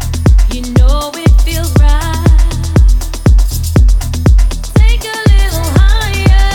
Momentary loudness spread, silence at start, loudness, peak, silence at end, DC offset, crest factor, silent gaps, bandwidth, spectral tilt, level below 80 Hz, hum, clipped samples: 2 LU; 0 s; -11 LUFS; 0 dBFS; 0 s; under 0.1%; 8 dB; none; 17 kHz; -5.5 dB/octave; -8 dBFS; none; under 0.1%